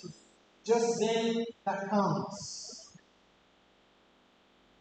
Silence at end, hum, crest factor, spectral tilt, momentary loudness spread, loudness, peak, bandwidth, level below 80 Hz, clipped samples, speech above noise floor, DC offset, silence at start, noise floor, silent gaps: 1.95 s; none; 18 dB; -4.5 dB/octave; 16 LU; -32 LUFS; -16 dBFS; 9 kHz; -76 dBFS; under 0.1%; 35 dB; under 0.1%; 0 s; -65 dBFS; none